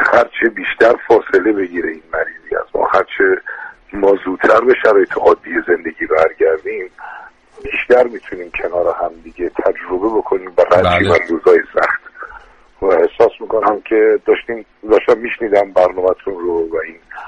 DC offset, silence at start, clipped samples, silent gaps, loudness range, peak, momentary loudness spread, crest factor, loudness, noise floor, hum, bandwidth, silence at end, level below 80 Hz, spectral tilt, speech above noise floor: under 0.1%; 0 s; under 0.1%; none; 3 LU; 0 dBFS; 13 LU; 14 dB; -14 LUFS; -40 dBFS; none; 8.8 kHz; 0 s; -46 dBFS; -6.5 dB/octave; 26 dB